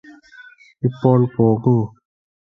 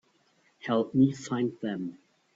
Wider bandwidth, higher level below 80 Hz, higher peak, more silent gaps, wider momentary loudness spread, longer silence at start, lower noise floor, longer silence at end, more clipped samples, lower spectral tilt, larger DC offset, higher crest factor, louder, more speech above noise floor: second, 5.8 kHz vs 7.8 kHz; first, -54 dBFS vs -68 dBFS; first, -2 dBFS vs -12 dBFS; neither; second, 9 LU vs 14 LU; first, 0.85 s vs 0.65 s; second, -45 dBFS vs -67 dBFS; first, 0.65 s vs 0.45 s; neither; first, -11.5 dB/octave vs -7 dB/octave; neither; about the same, 18 dB vs 18 dB; first, -17 LUFS vs -29 LUFS; second, 29 dB vs 40 dB